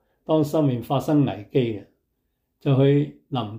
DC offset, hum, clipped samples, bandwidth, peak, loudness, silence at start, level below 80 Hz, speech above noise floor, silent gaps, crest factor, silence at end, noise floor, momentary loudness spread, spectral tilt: under 0.1%; none; under 0.1%; 16 kHz; -8 dBFS; -22 LUFS; 0.3 s; -62 dBFS; 53 dB; none; 16 dB; 0 s; -74 dBFS; 10 LU; -8.5 dB/octave